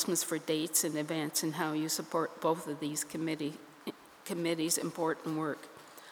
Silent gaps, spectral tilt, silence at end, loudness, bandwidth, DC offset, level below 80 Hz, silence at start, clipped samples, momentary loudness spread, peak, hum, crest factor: none; -3.5 dB/octave; 0 s; -34 LUFS; over 20 kHz; under 0.1%; -84 dBFS; 0 s; under 0.1%; 15 LU; -14 dBFS; none; 20 dB